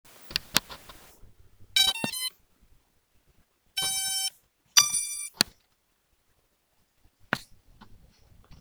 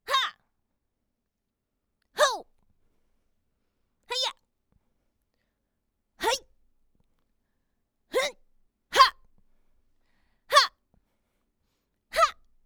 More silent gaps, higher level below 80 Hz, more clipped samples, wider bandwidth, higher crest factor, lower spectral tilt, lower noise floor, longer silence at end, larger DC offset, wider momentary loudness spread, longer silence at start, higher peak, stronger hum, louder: neither; about the same, -60 dBFS vs -64 dBFS; neither; about the same, over 20 kHz vs over 20 kHz; about the same, 30 dB vs 26 dB; about the same, 0.5 dB/octave vs 0.5 dB/octave; second, -71 dBFS vs -82 dBFS; second, 0.05 s vs 0.35 s; neither; about the same, 13 LU vs 12 LU; about the same, 0.2 s vs 0.1 s; first, -2 dBFS vs -6 dBFS; neither; about the same, -26 LUFS vs -25 LUFS